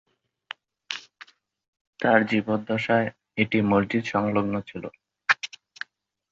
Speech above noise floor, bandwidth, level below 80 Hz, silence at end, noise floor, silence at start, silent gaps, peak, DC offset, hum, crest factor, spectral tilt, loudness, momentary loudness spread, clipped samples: 28 dB; 7.6 kHz; -60 dBFS; 0.85 s; -52 dBFS; 0.9 s; 1.68-1.73 s, 1.81-1.93 s; -4 dBFS; under 0.1%; none; 22 dB; -6 dB/octave; -25 LUFS; 19 LU; under 0.1%